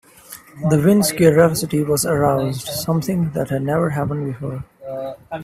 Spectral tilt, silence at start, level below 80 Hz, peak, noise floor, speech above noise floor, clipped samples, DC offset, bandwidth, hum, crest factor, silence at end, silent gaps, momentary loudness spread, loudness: -6 dB/octave; 0.3 s; -48 dBFS; 0 dBFS; -42 dBFS; 24 dB; under 0.1%; under 0.1%; 16 kHz; none; 18 dB; 0 s; none; 16 LU; -18 LUFS